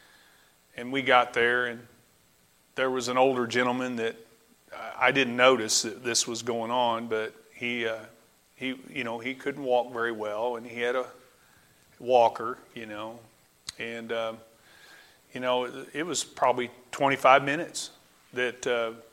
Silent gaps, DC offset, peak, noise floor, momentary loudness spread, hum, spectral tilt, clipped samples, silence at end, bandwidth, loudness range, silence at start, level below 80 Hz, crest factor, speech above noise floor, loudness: none; under 0.1%; -4 dBFS; -63 dBFS; 18 LU; none; -2.5 dB/octave; under 0.1%; 0.1 s; 16 kHz; 6 LU; 0.75 s; -72 dBFS; 24 dB; 36 dB; -27 LUFS